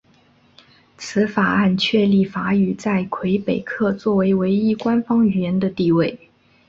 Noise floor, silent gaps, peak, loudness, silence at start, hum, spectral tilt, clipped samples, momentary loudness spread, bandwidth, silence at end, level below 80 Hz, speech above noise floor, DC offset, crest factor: -55 dBFS; none; -4 dBFS; -19 LUFS; 1 s; none; -7 dB/octave; under 0.1%; 5 LU; 7.6 kHz; 0.5 s; -54 dBFS; 37 dB; under 0.1%; 16 dB